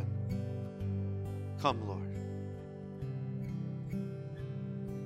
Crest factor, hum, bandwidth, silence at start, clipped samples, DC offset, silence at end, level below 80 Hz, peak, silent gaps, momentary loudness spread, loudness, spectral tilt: 24 dB; 50 Hz at -65 dBFS; 11.5 kHz; 0 s; under 0.1%; under 0.1%; 0 s; -58 dBFS; -14 dBFS; none; 9 LU; -39 LUFS; -8 dB/octave